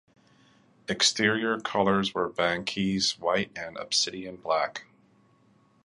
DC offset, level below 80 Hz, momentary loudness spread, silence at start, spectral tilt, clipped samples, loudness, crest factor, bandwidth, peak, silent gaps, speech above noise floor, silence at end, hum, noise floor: under 0.1%; -62 dBFS; 11 LU; 0.9 s; -3 dB/octave; under 0.1%; -27 LUFS; 20 dB; 11.5 kHz; -8 dBFS; none; 36 dB; 1 s; none; -63 dBFS